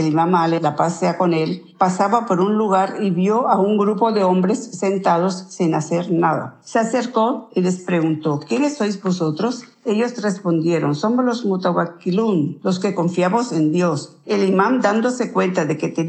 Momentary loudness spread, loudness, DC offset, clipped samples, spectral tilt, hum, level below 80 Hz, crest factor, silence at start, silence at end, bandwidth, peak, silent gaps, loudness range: 5 LU; -19 LUFS; under 0.1%; under 0.1%; -6.5 dB/octave; none; -76 dBFS; 18 dB; 0 s; 0 s; 9 kHz; -2 dBFS; none; 3 LU